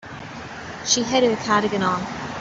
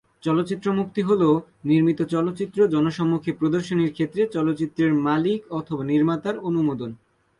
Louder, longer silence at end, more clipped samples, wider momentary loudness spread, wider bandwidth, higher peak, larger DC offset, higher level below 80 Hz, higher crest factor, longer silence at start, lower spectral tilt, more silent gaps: about the same, -21 LUFS vs -23 LUFS; second, 0 s vs 0.45 s; neither; first, 16 LU vs 6 LU; second, 8 kHz vs 11 kHz; first, -4 dBFS vs -8 dBFS; neither; first, -54 dBFS vs -62 dBFS; about the same, 18 dB vs 14 dB; second, 0 s vs 0.25 s; second, -3 dB/octave vs -8 dB/octave; neither